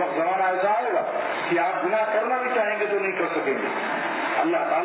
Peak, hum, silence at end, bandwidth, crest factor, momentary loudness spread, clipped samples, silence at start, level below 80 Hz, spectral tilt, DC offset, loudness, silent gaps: -12 dBFS; none; 0 s; 4 kHz; 12 dB; 3 LU; under 0.1%; 0 s; -82 dBFS; -8 dB/octave; under 0.1%; -24 LUFS; none